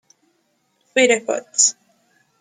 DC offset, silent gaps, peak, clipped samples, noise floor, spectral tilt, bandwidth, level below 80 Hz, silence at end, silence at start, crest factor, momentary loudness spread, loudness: under 0.1%; none; -2 dBFS; under 0.1%; -66 dBFS; 0 dB/octave; 9.8 kHz; -72 dBFS; 0.7 s; 0.95 s; 20 dB; 7 LU; -17 LUFS